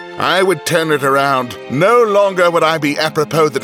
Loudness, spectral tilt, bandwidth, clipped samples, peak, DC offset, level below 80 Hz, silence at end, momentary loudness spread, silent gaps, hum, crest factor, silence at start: -13 LUFS; -4.5 dB/octave; 18 kHz; under 0.1%; -2 dBFS; under 0.1%; -60 dBFS; 0 s; 5 LU; none; none; 12 dB; 0 s